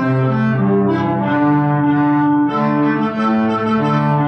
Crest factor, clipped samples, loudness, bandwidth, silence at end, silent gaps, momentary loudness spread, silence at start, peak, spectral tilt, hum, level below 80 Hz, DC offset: 8 dB; under 0.1%; -15 LUFS; 6.2 kHz; 0 s; none; 2 LU; 0 s; -6 dBFS; -9.5 dB/octave; none; -54 dBFS; under 0.1%